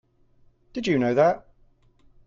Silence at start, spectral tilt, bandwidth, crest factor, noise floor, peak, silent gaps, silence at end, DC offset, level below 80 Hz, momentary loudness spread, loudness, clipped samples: 0.75 s; -6.5 dB/octave; 7.6 kHz; 18 dB; -59 dBFS; -8 dBFS; none; 0.9 s; under 0.1%; -60 dBFS; 14 LU; -23 LUFS; under 0.1%